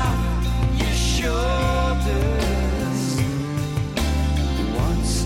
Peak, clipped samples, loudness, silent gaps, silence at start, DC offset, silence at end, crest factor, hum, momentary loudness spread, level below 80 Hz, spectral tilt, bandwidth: -10 dBFS; under 0.1%; -22 LUFS; none; 0 s; under 0.1%; 0 s; 10 dB; none; 3 LU; -24 dBFS; -5.5 dB/octave; 16 kHz